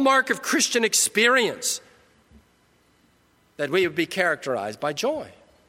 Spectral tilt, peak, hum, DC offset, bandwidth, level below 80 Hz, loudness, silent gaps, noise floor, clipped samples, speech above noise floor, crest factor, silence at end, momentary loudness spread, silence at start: -1.5 dB/octave; -6 dBFS; none; under 0.1%; 16.5 kHz; -68 dBFS; -22 LUFS; none; -62 dBFS; under 0.1%; 39 dB; 18 dB; 0.35 s; 11 LU; 0 s